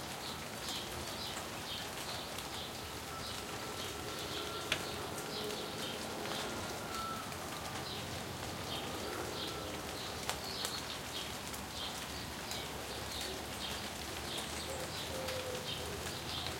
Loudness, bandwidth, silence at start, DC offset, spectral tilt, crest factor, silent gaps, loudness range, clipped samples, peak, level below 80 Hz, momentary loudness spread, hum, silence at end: -40 LUFS; 16.5 kHz; 0 s; under 0.1%; -2.5 dB/octave; 30 dB; none; 2 LU; under 0.1%; -12 dBFS; -58 dBFS; 3 LU; none; 0 s